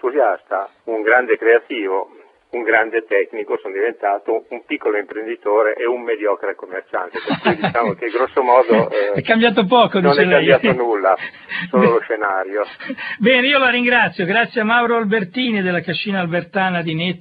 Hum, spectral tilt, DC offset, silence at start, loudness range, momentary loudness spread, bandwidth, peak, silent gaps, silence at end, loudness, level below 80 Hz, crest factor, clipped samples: none; -9 dB/octave; under 0.1%; 0.05 s; 6 LU; 11 LU; 5 kHz; 0 dBFS; none; 0.05 s; -17 LUFS; -62 dBFS; 18 dB; under 0.1%